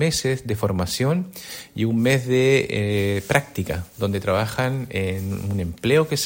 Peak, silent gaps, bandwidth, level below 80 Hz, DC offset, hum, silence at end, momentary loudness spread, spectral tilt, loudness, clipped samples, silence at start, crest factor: 0 dBFS; none; 16.5 kHz; -50 dBFS; under 0.1%; none; 0 s; 9 LU; -5.5 dB/octave; -22 LUFS; under 0.1%; 0 s; 20 dB